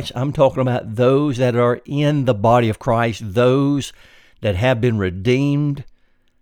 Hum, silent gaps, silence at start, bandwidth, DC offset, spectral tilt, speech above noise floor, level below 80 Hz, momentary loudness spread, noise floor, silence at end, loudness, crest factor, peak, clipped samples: none; none; 0 s; 14.5 kHz; under 0.1%; -7 dB/octave; 37 dB; -46 dBFS; 8 LU; -54 dBFS; 0.55 s; -18 LUFS; 16 dB; -2 dBFS; under 0.1%